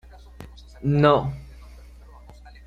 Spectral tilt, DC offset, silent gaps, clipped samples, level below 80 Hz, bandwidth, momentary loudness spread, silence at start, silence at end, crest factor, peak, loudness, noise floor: -8.5 dB/octave; under 0.1%; none; under 0.1%; -44 dBFS; 7.2 kHz; 26 LU; 0.4 s; 0.15 s; 22 dB; -4 dBFS; -21 LUFS; -45 dBFS